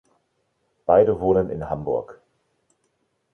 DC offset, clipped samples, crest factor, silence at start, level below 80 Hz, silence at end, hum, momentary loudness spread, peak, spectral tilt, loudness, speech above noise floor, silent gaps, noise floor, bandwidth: under 0.1%; under 0.1%; 20 dB; 0.9 s; -48 dBFS; 1.2 s; none; 13 LU; -4 dBFS; -10 dB/octave; -21 LUFS; 51 dB; none; -71 dBFS; 3.5 kHz